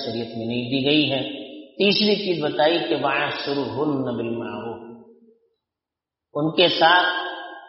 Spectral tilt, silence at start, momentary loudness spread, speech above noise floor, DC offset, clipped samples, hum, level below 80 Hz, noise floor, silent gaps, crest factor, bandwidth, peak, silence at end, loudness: -2 dB/octave; 0 s; 15 LU; 66 dB; under 0.1%; under 0.1%; none; -66 dBFS; -87 dBFS; none; 20 dB; 6 kHz; -2 dBFS; 0 s; -21 LUFS